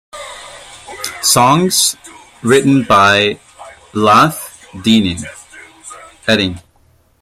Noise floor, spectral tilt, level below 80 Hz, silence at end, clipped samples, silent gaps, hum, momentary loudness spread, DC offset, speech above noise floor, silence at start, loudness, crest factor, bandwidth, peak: -52 dBFS; -3.5 dB/octave; -50 dBFS; 0.65 s; under 0.1%; none; none; 23 LU; under 0.1%; 41 dB; 0.15 s; -12 LUFS; 14 dB; 16 kHz; 0 dBFS